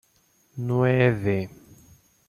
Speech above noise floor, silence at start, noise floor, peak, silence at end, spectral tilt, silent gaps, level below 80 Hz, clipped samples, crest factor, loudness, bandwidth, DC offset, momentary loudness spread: 42 dB; 0.55 s; -64 dBFS; -6 dBFS; 0.75 s; -8.5 dB/octave; none; -58 dBFS; under 0.1%; 20 dB; -23 LUFS; 13.5 kHz; under 0.1%; 17 LU